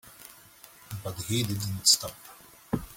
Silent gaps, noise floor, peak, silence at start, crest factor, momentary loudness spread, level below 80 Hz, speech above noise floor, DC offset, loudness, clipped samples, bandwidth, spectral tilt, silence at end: none; -53 dBFS; -6 dBFS; 0.05 s; 26 dB; 26 LU; -56 dBFS; 25 dB; under 0.1%; -26 LUFS; under 0.1%; 17 kHz; -2.5 dB/octave; 0 s